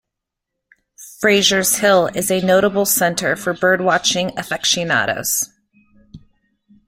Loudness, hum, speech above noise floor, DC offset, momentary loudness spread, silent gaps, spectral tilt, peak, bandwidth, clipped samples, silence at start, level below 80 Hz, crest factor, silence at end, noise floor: -16 LUFS; none; 65 dB; under 0.1%; 6 LU; none; -2.5 dB/octave; -2 dBFS; 16.5 kHz; under 0.1%; 1 s; -54 dBFS; 18 dB; 0.7 s; -81 dBFS